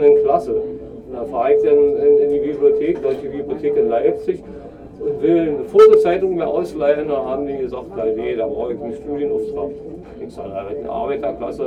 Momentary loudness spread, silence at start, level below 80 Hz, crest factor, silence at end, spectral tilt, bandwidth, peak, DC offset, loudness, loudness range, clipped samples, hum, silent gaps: 15 LU; 0 s; -46 dBFS; 16 dB; 0 s; -7.5 dB/octave; 6 kHz; -2 dBFS; under 0.1%; -18 LUFS; 8 LU; under 0.1%; none; none